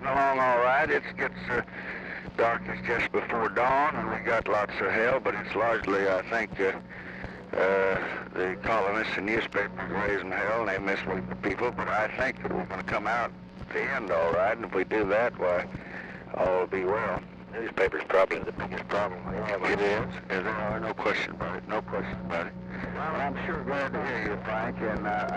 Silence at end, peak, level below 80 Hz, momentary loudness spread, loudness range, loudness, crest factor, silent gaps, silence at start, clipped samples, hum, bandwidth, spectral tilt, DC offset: 0 s; -14 dBFS; -52 dBFS; 10 LU; 4 LU; -29 LUFS; 14 dB; none; 0 s; under 0.1%; none; 10 kHz; -6.5 dB/octave; under 0.1%